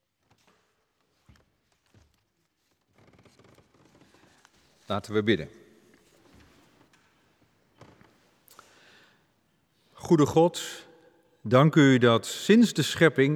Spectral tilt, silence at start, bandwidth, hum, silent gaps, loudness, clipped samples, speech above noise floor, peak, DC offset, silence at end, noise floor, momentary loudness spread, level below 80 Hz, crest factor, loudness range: -6 dB/octave; 4.9 s; 17.5 kHz; none; none; -23 LUFS; under 0.1%; 52 dB; -4 dBFS; under 0.1%; 0 s; -74 dBFS; 20 LU; -66 dBFS; 24 dB; 12 LU